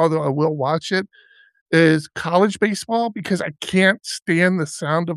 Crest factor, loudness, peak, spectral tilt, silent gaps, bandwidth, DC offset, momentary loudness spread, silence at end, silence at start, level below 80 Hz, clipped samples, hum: 18 dB; -19 LUFS; -2 dBFS; -5.5 dB/octave; 1.61-1.66 s; 12.5 kHz; under 0.1%; 7 LU; 0 s; 0 s; -64 dBFS; under 0.1%; none